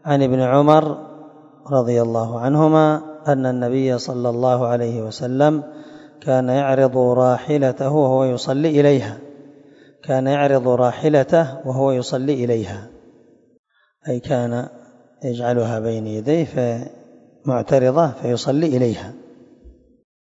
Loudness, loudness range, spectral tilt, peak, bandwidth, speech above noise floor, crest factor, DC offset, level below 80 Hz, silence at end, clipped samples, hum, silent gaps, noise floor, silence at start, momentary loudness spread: -18 LUFS; 6 LU; -7.5 dB/octave; 0 dBFS; 8 kHz; 34 dB; 18 dB; under 0.1%; -60 dBFS; 0.55 s; under 0.1%; none; 13.59-13.64 s; -52 dBFS; 0.05 s; 14 LU